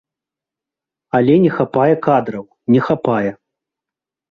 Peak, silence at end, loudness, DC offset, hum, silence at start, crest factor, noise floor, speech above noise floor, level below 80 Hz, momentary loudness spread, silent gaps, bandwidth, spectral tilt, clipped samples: -2 dBFS; 1 s; -15 LUFS; under 0.1%; none; 1.15 s; 16 dB; -87 dBFS; 72 dB; -56 dBFS; 10 LU; none; 6.4 kHz; -9.5 dB/octave; under 0.1%